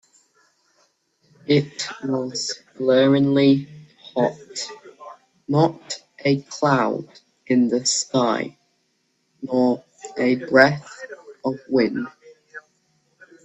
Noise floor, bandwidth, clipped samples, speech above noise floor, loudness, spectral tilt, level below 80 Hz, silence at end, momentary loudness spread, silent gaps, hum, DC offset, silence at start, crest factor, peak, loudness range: -69 dBFS; 8.4 kHz; under 0.1%; 49 dB; -21 LUFS; -5 dB/octave; -64 dBFS; 0.85 s; 21 LU; none; none; under 0.1%; 1.5 s; 22 dB; 0 dBFS; 3 LU